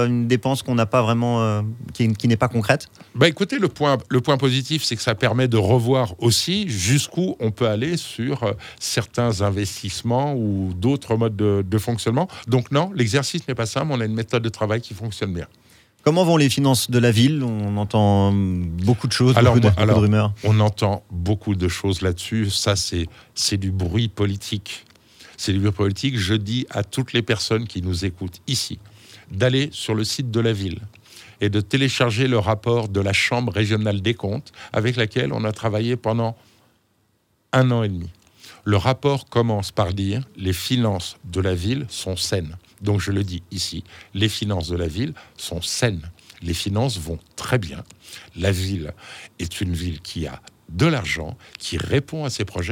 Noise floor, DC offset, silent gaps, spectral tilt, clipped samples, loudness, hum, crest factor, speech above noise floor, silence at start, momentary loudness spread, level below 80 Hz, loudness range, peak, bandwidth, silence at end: -65 dBFS; under 0.1%; none; -5.5 dB/octave; under 0.1%; -21 LUFS; none; 22 dB; 45 dB; 0 s; 11 LU; -50 dBFS; 7 LU; 0 dBFS; 16.5 kHz; 0 s